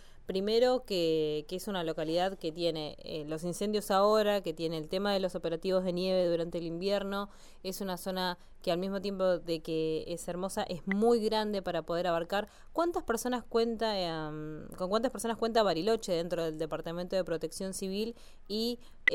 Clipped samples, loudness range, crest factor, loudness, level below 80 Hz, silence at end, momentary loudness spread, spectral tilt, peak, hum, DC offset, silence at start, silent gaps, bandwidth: under 0.1%; 3 LU; 20 dB; -33 LUFS; -54 dBFS; 0 s; 10 LU; -5 dB/octave; -12 dBFS; none; under 0.1%; 0 s; none; 17 kHz